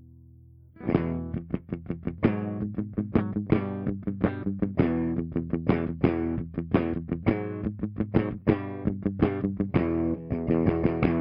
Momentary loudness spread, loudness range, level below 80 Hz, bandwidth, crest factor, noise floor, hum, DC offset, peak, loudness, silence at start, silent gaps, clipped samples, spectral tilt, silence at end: 7 LU; 2 LU; -46 dBFS; 5.4 kHz; 20 dB; -52 dBFS; none; under 0.1%; -6 dBFS; -28 LUFS; 0 s; none; under 0.1%; -12 dB/octave; 0 s